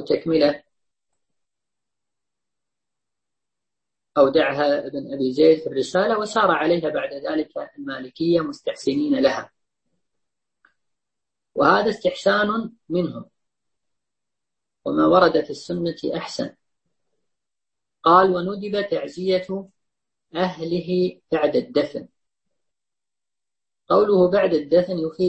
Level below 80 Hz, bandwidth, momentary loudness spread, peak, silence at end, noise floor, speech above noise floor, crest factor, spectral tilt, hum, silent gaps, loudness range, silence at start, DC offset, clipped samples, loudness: -60 dBFS; 8.6 kHz; 14 LU; -2 dBFS; 0 s; under -90 dBFS; over 70 dB; 20 dB; -6 dB/octave; none; none; 5 LU; 0 s; under 0.1%; under 0.1%; -21 LUFS